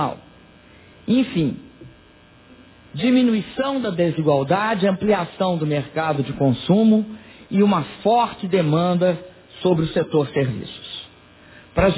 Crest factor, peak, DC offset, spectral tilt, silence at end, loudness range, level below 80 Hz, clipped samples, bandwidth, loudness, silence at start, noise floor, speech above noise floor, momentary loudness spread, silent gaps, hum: 16 dB; -4 dBFS; under 0.1%; -11.5 dB/octave; 0 s; 3 LU; -46 dBFS; under 0.1%; 4 kHz; -20 LUFS; 0 s; -50 dBFS; 30 dB; 14 LU; none; none